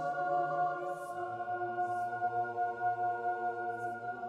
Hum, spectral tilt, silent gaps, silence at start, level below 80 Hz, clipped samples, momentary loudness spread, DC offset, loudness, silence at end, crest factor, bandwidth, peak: none; -6.5 dB/octave; none; 0 s; -78 dBFS; under 0.1%; 6 LU; under 0.1%; -35 LUFS; 0 s; 12 dB; 11 kHz; -22 dBFS